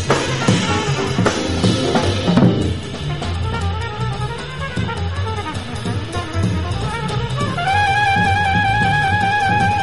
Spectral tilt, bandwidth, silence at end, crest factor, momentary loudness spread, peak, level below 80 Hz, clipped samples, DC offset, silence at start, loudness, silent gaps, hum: -5 dB/octave; 11.5 kHz; 0 s; 18 dB; 9 LU; 0 dBFS; -34 dBFS; under 0.1%; 1%; 0 s; -18 LUFS; none; none